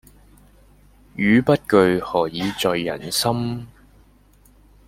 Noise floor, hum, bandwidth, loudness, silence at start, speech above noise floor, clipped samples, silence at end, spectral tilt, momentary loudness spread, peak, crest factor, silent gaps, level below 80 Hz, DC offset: -53 dBFS; 50 Hz at -45 dBFS; 16.5 kHz; -20 LUFS; 1.15 s; 34 dB; under 0.1%; 1.2 s; -5 dB/octave; 10 LU; -2 dBFS; 20 dB; none; -50 dBFS; under 0.1%